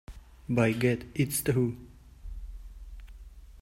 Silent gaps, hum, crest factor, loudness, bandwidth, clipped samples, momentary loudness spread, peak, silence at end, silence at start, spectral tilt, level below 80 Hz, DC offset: none; none; 20 dB; -28 LUFS; 16 kHz; under 0.1%; 24 LU; -10 dBFS; 0 s; 0.1 s; -6 dB/octave; -46 dBFS; under 0.1%